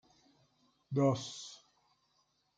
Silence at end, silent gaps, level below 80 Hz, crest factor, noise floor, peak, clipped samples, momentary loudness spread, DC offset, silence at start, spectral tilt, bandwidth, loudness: 1.05 s; none; -80 dBFS; 20 dB; -77 dBFS; -18 dBFS; under 0.1%; 19 LU; under 0.1%; 0.9 s; -6.5 dB/octave; 9.2 kHz; -34 LUFS